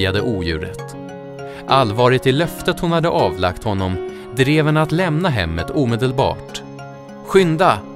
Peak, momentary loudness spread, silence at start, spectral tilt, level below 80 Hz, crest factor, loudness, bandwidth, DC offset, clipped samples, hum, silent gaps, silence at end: 0 dBFS; 17 LU; 0 s; -6.5 dB/octave; -40 dBFS; 18 dB; -17 LUFS; 16 kHz; under 0.1%; under 0.1%; none; none; 0 s